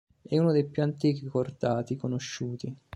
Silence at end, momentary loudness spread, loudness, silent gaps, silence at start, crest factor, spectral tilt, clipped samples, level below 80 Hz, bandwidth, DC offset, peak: 0.2 s; 10 LU; -29 LUFS; none; 0.3 s; 16 dB; -7 dB/octave; under 0.1%; -66 dBFS; 10.5 kHz; under 0.1%; -14 dBFS